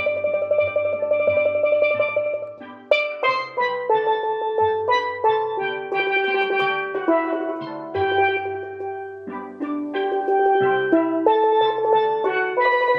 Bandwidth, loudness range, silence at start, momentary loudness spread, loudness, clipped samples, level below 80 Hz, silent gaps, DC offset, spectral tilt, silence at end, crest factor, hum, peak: 6.2 kHz; 4 LU; 0 s; 11 LU; -21 LUFS; under 0.1%; -70 dBFS; none; under 0.1%; -6 dB/octave; 0 s; 18 dB; none; -4 dBFS